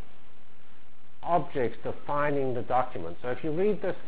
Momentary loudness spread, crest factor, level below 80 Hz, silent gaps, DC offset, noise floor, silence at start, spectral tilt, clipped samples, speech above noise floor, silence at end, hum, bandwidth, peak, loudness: 8 LU; 18 dB; -58 dBFS; none; 4%; -60 dBFS; 1.2 s; -10 dB/octave; under 0.1%; 30 dB; 0 s; none; 4 kHz; -12 dBFS; -30 LUFS